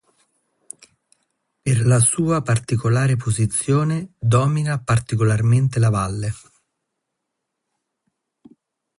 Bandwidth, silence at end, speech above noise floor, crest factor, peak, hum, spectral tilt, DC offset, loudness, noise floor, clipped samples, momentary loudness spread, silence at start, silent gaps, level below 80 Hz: 11.5 kHz; 2.6 s; 61 dB; 16 dB; -4 dBFS; none; -6 dB/octave; under 0.1%; -19 LUFS; -79 dBFS; under 0.1%; 13 LU; 1.65 s; none; -46 dBFS